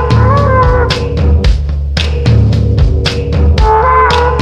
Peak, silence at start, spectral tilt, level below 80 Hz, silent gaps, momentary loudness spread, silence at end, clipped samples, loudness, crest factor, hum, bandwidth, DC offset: 0 dBFS; 0 s; -6.5 dB/octave; -12 dBFS; none; 5 LU; 0 s; 0.1%; -10 LUFS; 8 dB; none; 8.6 kHz; under 0.1%